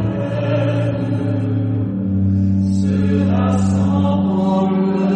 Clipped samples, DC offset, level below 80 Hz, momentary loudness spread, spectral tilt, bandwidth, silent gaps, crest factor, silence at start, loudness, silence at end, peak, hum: under 0.1%; under 0.1%; -44 dBFS; 4 LU; -9 dB/octave; 8.8 kHz; none; 10 dB; 0 s; -17 LUFS; 0 s; -6 dBFS; none